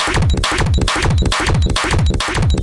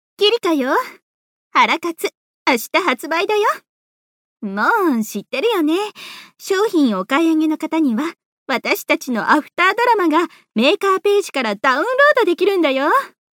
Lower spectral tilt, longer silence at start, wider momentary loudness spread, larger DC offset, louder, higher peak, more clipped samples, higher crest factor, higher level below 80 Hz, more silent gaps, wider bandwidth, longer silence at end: about the same, -4.5 dB/octave vs -3.5 dB/octave; second, 0 s vs 0.2 s; second, 1 LU vs 9 LU; neither; about the same, -16 LUFS vs -17 LUFS; about the same, -2 dBFS vs -2 dBFS; neither; about the same, 12 dB vs 16 dB; first, -20 dBFS vs -74 dBFS; second, none vs 1.02-1.51 s, 2.17-2.46 s, 3.69-4.36 s, 8.25-8.46 s; second, 11.5 kHz vs 18 kHz; second, 0 s vs 0.3 s